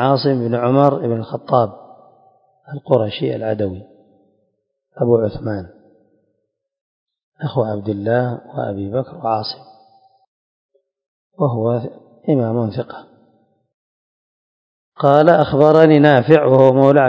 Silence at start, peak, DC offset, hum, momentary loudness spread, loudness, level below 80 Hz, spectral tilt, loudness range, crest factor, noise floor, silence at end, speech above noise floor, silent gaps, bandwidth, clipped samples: 0 s; 0 dBFS; under 0.1%; none; 17 LU; -16 LUFS; -52 dBFS; -9.5 dB/octave; 10 LU; 18 dB; -72 dBFS; 0 s; 57 dB; 6.81-7.06 s, 7.23-7.32 s, 10.27-10.69 s, 11.08-11.31 s, 13.74-14.92 s; 7.2 kHz; 0.1%